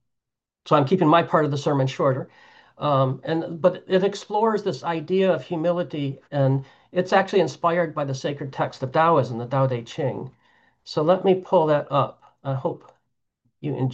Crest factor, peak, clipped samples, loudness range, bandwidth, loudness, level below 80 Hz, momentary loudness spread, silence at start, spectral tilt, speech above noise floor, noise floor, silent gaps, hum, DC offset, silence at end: 18 dB; -6 dBFS; under 0.1%; 2 LU; 8 kHz; -23 LUFS; -68 dBFS; 10 LU; 0.65 s; -7 dB/octave; 62 dB; -84 dBFS; none; none; under 0.1%; 0 s